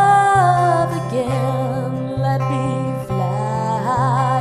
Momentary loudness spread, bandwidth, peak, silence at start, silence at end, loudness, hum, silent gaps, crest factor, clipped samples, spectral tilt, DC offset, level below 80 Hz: 8 LU; 12.5 kHz; -4 dBFS; 0 s; 0 s; -18 LUFS; none; none; 14 dB; under 0.1%; -7 dB/octave; under 0.1%; -46 dBFS